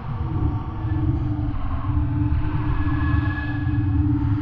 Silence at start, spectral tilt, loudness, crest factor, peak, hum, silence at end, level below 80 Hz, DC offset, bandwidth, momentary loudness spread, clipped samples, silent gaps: 0 s; -10.5 dB/octave; -24 LUFS; 12 dB; -8 dBFS; none; 0 s; -28 dBFS; under 0.1%; 4.9 kHz; 5 LU; under 0.1%; none